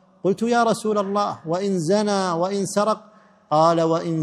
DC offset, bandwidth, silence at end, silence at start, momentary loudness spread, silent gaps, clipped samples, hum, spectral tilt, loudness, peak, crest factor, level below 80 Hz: under 0.1%; 13 kHz; 0 s; 0.25 s; 6 LU; none; under 0.1%; none; -5.5 dB/octave; -21 LUFS; -4 dBFS; 16 dB; -70 dBFS